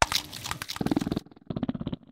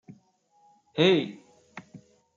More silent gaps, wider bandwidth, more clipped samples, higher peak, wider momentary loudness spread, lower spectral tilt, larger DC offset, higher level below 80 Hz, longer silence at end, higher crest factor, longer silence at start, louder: neither; first, 16.5 kHz vs 7.4 kHz; neither; first, 0 dBFS vs -10 dBFS; second, 8 LU vs 25 LU; second, -4 dB/octave vs -6 dB/octave; neither; first, -48 dBFS vs -76 dBFS; second, 0.15 s vs 0.4 s; first, 30 dB vs 20 dB; second, 0 s vs 0.95 s; second, -31 LUFS vs -25 LUFS